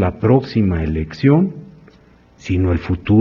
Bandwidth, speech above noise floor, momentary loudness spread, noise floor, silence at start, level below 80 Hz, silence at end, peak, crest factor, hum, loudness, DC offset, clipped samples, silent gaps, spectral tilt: 7.2 kHz; 33 dB; 8 LU; -48 dBFS; 0 s; -34 dBFS; 0 s; -2 dBFS; 16 dB; none; -17 LUFS; under 0.1%; under 0.1%; none; -9 dB/octave